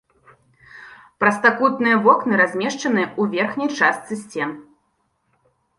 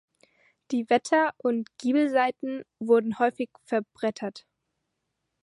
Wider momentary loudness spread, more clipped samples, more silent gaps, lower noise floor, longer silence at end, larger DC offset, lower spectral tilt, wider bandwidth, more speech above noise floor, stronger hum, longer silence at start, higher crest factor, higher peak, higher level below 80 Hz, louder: about the same, 12 LU vs 12 LU; neither; neither; second, -68 dBFS vs -80 dBFS; about the same, 1.15 s vs 1.05 s; neither; about the same, -5 dB/octave vs -5 dB/octave; about the same, 11.5 kHz vs 11.5 kHz; second, 49 dB vs 55 dB; neither; about the same, 0.75 s vs 0.7 s; about the same, 18 dB vs 20 dB; first, -2 dBFS vs -8 dBFS; first, -66 dBFS vs -78 dBFS; first, -19 LUFS vs -26 LUFS